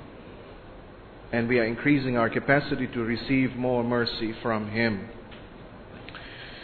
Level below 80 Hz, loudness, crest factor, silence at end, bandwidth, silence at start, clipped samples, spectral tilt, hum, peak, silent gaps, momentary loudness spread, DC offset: -50 dBFS; -26 LUFS; 22 dB; 0 s; 4.6 kHz; 0 s; under 0.1%; -9 dB/octave; none; -6 dBFS; none; 22 LU; under 0.1%